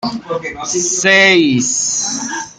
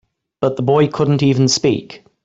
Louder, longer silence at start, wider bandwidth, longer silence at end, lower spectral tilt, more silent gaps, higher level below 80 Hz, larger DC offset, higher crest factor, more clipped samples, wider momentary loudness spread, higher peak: first, -12 LUFS vs -16 LUFS; second, 0 s vs 0.4 s; first, 10 kHz vs 8 kHz; second, 0.05 s vs 0.3 s; second, -2 dB/octave vs -5.5 dB/octave; neither; about the same, -54 dBFS vs -54 dBFS; neither; about the same, 14 dB vs 14 dB; neither; first, 13 LU vs 7 LU; about the same, -2 dBFS vs -2 dBFS